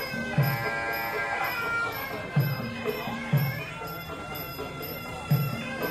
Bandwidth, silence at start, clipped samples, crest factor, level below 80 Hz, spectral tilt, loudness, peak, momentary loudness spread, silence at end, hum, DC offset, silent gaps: 14 kHz; 0 s; under 0.1%; 16 dB; -54 dBFS; -6 dB/octave; -30 LUFS; -12 dBFS; 8 LU; 0 s; none; under 0.1%; none